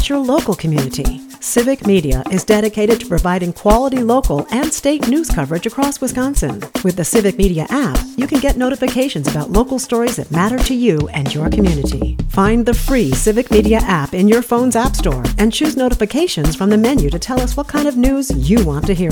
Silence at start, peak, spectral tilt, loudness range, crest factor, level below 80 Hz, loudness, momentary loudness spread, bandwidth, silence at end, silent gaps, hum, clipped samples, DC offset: 0 s; 0 dBFS; -5.5 dB/octave; 2 LU; 14 dB; -24 dBFS; -15 LUFS; 5 LU; 19.5 kHz; 0 s; none; none; under 0.1%; under 0.1%